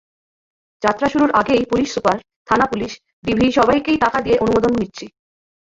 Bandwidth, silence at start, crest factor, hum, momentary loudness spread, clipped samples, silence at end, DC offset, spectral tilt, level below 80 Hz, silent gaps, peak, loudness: 7.8 kHz; 0.8 s; 18 dB; none; 11 LU; under 0.1%; 0.7 s; under 0.1%; -5.5 dB/octave; -44 dBFS; 2.36-2.46 s, 3.13-3.23 s; -2 dBFS; -17 LUFS